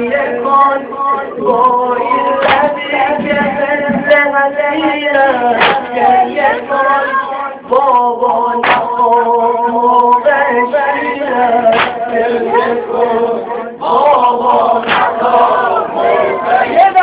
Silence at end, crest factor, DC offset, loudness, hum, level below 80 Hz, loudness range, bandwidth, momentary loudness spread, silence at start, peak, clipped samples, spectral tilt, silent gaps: 0 s; 12 dB; under 0.1%; -11 LUFS; none; -50 dBFS; 2 LU; 4 kHz; 5 LU; 0 s; 0 dBFS; 0.2%; -8 dB/octave; none